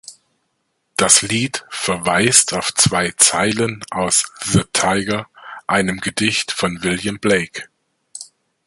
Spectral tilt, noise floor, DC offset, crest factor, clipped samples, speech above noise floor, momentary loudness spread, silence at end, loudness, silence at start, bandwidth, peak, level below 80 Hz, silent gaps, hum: -2.5 dB/octave; -70 dBFS; under 0.1%; 18 dB; under 0.1%; 52 dB; 15 LU; 0.4 s; -16 LUFS; 0.1 s; 16 kHz; 0 dBFS; -48 dBFS; none; none